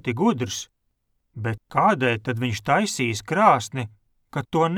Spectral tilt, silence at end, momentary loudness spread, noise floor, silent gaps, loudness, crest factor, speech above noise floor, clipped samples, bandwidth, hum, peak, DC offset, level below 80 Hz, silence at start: -5 dB/octave; 0 s; 14 LU; -72 dBFS; none; -23 LUFS; 20 dB; 50 dB; under 0.1%; 18 kHz; none; -2 dBFS; under 0.1%; -58 dBFS; 0.05 s